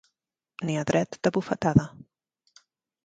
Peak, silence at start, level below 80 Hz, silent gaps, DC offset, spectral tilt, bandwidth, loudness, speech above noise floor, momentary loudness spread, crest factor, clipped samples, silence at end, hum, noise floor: -6 dBFS; 0.6 s; -54 dBFS; none; under 0.1%; -6.5 dB/octave; 9.2 kHz; -26 LUFS; 58 dB; 14 LU; 24 dB; under 0.1%; 1.2 s; none; -84 dBFS